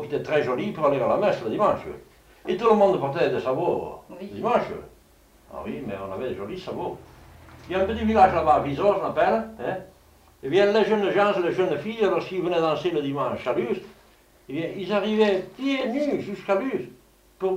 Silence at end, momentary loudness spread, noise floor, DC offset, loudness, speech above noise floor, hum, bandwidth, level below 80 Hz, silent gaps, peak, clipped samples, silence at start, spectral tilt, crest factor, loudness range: 0 s; 15 LU; -56 dBFS; under 0.1%; -24 LUFS; 32 dB; none; 15.5 kHz; -52 dBFS; none; -4 dBFS; under 0.1%; 0 s; -6.5 dB/octave; 20 dB; 7 LU